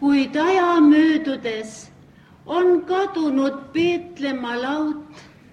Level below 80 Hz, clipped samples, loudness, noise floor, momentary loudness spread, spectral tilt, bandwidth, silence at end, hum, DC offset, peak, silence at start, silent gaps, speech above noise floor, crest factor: -62 dBFS; under 0.1%; -20 LUFS; -48 dBFS; 13 LU; -5 dB/octave; 9.6 kHz; 0.3 s; none; under 0.1%; -6 dBFS; 0 s; none; 29 dB; 14 dB